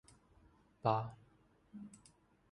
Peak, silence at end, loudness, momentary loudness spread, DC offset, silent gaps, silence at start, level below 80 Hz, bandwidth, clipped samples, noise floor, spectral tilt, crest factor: -18 dBFS; 0.55 s; -39 LUFS; 22 LU; under 0.1%; none; 0.85 s; -72 dBFS; 11 kHz; under 0.1%; -70 dBFS; -7 dB/octave; 26 dB